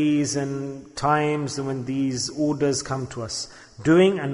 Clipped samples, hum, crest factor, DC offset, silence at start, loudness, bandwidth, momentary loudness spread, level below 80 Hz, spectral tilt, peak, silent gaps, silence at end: under 0.1%; none; 16 dB; under 0.1%; 0 s; -24 LUFS; 11 kHz; 12 LU; -54 dBFS; -5 dB/octave; -6 dBFS; none; 0 s